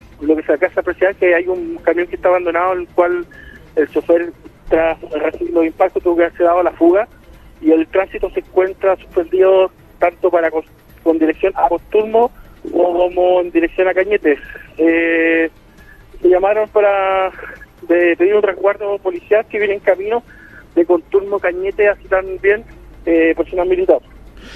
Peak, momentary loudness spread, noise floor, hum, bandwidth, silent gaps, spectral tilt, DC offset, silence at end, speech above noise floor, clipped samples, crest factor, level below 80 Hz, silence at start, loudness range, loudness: 0 dBFS; 7 LU; -42 dBFS; none; 12 kHz; none; -7 dB/octave; under 0.1%; 0 s; 27 dB; under 0.1%; 16 dB; -42 dBFS; 0.2 s; 2 LU; -15 LUFS